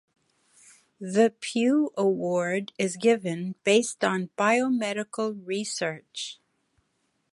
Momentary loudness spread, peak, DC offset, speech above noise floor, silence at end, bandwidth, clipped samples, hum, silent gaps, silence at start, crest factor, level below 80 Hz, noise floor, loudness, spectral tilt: 9 LU; -8 dBFS; under 0.1%; 48 dB; 1 s; 11.5 kHz; under 0.1%; none; none; 1 s; 18 dB; -78 dBFS; -74 dBFS; -26 LUFS; -4.5 dB/octave